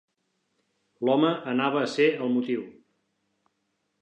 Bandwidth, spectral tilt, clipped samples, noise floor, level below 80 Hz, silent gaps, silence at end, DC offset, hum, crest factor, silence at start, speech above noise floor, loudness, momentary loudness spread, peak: 9.4 kHz; -6 dB/octave; under 0.1%; -76 dBFS; -82 dBFS; none; 1.3 s; under 0.1%; none; 18 dB; 1 s; 52 dB; -25 LUFS; 8 LU; -10 dBFS